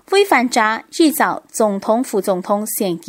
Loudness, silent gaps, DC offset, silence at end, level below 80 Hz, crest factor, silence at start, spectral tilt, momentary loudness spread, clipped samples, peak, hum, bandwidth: -17 LUFS; none; under 0.1%; 0 s; -66 dBFS; 16 dB; 0.1 s; -3.5 dB/octave; 6 LU; under 0.1%; 0 dBFS; none; 16.5 kHz